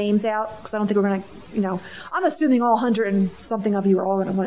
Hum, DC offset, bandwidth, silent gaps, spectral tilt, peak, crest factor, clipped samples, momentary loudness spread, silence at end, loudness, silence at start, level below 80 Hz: none; under 0.1%; 4 kHz; none; -11.5 dB/octave; -8 dBFS; 14 dB; under 0.1%; 9 LU; 0 s; -22 LUFS; 0 s; -58 dBFS